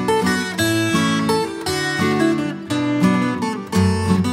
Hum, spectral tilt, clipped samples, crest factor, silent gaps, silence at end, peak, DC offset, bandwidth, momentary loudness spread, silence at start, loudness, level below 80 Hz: none; -5 dB/octave; under 0.1%; 14 dB; none; 0 s; -4 dBFS; under 0.1%; 16 kHz; 5 LU; 0 s; -19 LUFS; -50 dBFS